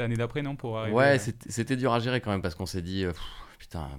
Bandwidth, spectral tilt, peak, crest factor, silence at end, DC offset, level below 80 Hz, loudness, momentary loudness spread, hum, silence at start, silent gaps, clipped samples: 16 kHz; -5.5 dB/octave; -8 dBFS; 20 dB; 0 s; under 0.1%; -48 dBFS; -28 LUFS; 17 LU; none; 0 s; none; under 0.1%